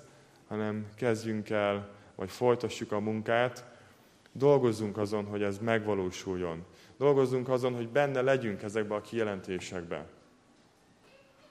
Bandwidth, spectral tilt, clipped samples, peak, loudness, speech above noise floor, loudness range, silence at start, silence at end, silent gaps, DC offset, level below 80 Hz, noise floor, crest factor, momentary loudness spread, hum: 14.5 kHz; -6 dB/octave; under 0.1%; -12 dBFS; -31 LUFS; 32 dB; 3 LU; 0.5 s; 1.4 s; none; under 0.1%; -70 dBFS; -63 dBFS; 20 dB; 13 LU; none